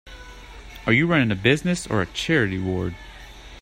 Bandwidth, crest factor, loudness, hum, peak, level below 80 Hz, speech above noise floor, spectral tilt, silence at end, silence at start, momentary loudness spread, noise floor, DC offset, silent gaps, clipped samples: 15.5 kHz; 20 dB; -22 LUFS; none; -4 dBFS; -44 dBFS; 20 dB; -5.5 dB/octave; 0 s; 0.05 s; 23 LU; -42 dBFS; under 0.1%; none; under 0.1%